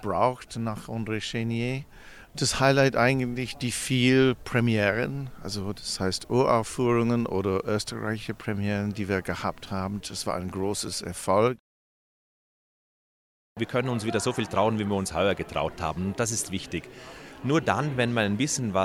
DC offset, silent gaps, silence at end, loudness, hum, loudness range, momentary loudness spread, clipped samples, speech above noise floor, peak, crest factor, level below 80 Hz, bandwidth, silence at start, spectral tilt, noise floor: under 0.1%; 11.59-13.56 s; 0 s; -27 LUFS; none; 6 LU; 10 LU; under 0.1%; over 63 dB; -6 dBFS; 20 dB; -52 dBFS; 16 kHz; 0 s; -5 dB/octave; under -90 dBFS